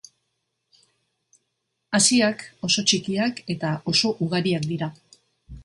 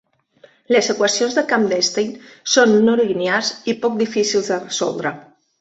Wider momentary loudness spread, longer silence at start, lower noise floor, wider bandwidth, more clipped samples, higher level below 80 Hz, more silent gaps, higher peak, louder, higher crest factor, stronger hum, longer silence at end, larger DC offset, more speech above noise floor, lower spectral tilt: about the same, 11 LU vs 10 LU; first, 1.9 s vs 0.7 s; first, -77 dBFS vs -52 dBFS; first, 11.5 kHz vs 8.2 kHz; neither; first, -56 dBFS vs -64 dBFS; neither; about the same, -4 dBFS vs -2 dBFS; second, -22 LUFS vs -18 LUFS; about the same, 20 dB vs 16 dB; neither; second, 0 s vs 0.4 s; neither; first, 54 dB vs 34 dB; about the same, -3.5 dB/octave vs -3 dB/octave